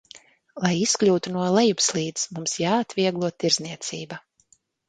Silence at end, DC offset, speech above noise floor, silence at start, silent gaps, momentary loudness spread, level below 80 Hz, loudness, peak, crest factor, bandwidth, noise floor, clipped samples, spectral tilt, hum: 0.7 s; under 0.1%; 39 dB; 0.15 s; none; 12 LU; -66 dBFS; -23 LUFS; -4 dBFS; 22 dB; 9.6 kHz; -63 dBFS; under 0.1%; -3.5 dB/octave; none